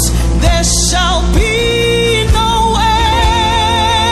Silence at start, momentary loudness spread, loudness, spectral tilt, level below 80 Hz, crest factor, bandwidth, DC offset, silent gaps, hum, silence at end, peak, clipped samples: 0 s; 2 LU; -11 LUFS; -3.5 dB/octave; -16 dBFS; 10 dB; 14 kHz; under 0.1%; none; none; 0 s; 0 dBFS; under 0.1%